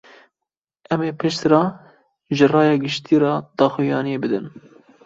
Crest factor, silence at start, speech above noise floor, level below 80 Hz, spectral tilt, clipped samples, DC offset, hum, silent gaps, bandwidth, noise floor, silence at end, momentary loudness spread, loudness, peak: 18 dB; 0.9 s; 67 dB; -62 dBFS; -6.5 dB/octave; under 0.1%; under 0.1%; none; none; 7.8 kHz; -85 dBFS; 0.55 s; 9 LU; -19 LUFS; -2 dBFS